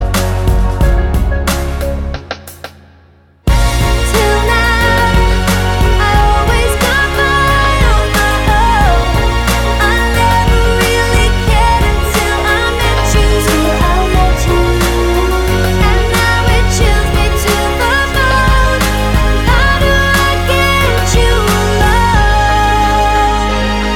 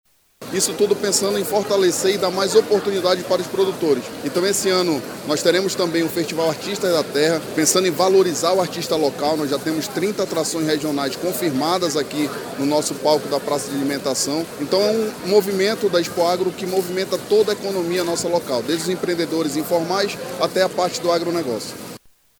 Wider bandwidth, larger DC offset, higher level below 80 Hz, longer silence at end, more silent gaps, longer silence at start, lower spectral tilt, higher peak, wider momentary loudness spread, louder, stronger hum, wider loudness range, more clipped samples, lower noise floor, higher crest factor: second, 17 kHz vs over 20 kHz; neither; first, -14 dBFS vs -60 dBFS; second, 0 s vs 0.45 s; neither; second, 0 s vs 0.4 s; about the same, -4.5 dB/octave vs -3.5 dB/octave; about the same, 0 dBFS vs -2 dBFS; about the same, 4 LU vs 6 LU; first, -11 LUFS vs -20 LUFS; neither; about the same, 3 LU vs 3 LU; neither; about the same, -44 dBFS vs -41 dBFS; second, 10 dB vs 18 dB